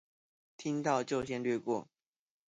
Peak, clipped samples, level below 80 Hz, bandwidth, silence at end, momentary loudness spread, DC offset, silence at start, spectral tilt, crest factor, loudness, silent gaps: -18 dBFS; under 0.1%; -70 dBFS; 9.4 kHz; 0.7 s; 6 LU; under 0.1%; 0.6 s; -5.5 dB/octave; 20 dB; -35 LUFS; none